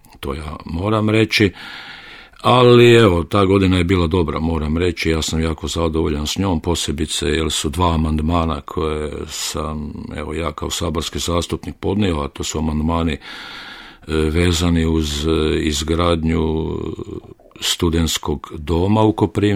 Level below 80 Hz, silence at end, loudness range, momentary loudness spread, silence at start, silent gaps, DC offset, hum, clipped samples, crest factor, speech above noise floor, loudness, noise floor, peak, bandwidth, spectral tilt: -30 dBFS; 0 s; 8 LU; 14 LU; 0.15 s; none; under 0.1%; none; under 0.1%; 18 dB; 21 dB; -18 LUFS; -39 dBFS; 0 dBFS; 16 kHz; -5 dB/octave